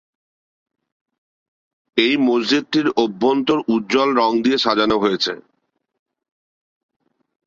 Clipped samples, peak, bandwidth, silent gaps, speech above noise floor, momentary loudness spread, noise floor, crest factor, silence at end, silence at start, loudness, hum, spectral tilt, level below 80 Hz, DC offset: under 0.1%; -2 dBFS; 7.6 kHz; none; 53 dB; 4 LU; -70 dBFS; 18 dB; 2.1 s; 1.95 s; -18 LUFS; none; -4.5 dB/octave; -60 dBFS; under 0.1%